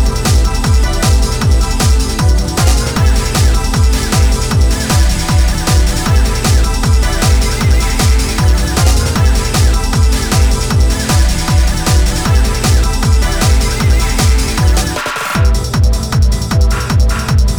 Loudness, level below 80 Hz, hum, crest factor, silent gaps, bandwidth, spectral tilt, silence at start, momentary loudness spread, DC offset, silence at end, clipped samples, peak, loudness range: -12 LUFS; -12 dBFS; none; 8 dB; none; over 20 kHz; -4.5 dB/octave; 0 s; 1 LU; under 0.1%; 0 s; under 0.1%; -2 dBFS; 1 LU